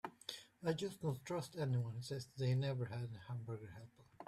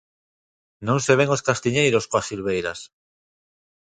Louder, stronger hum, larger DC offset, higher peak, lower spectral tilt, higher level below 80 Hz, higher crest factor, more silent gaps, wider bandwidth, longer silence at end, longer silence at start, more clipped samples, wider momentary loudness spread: second, -43 LUFS vs -21 LUFS; neither; neither; second, -26 dBFS vs -2 dBFS; first, -6.5 dB/octave vs -4.5 dB/octave; second, -74 dBFS vs -56 dBFS; second, 16 dB vs 22 dB; neither; first, 14 kHz vs 9.6 kHz; second, 0 s vs 1 s; second, 0.05 s vs 0.8 s; neither; about the same, 11 LU vs 11 LU